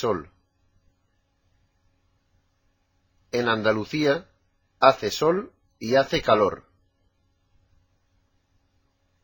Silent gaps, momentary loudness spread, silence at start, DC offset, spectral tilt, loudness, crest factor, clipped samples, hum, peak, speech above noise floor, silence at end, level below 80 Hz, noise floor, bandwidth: none; 11 LU; 0 s; under 0.1%; -5 dB/octave; -23 LUFS; 26 dB; under 0.1%; none; -2 dBFS; 47 dB; 2.65 s; -58 dBFS; -70 dBFS; 17 kHz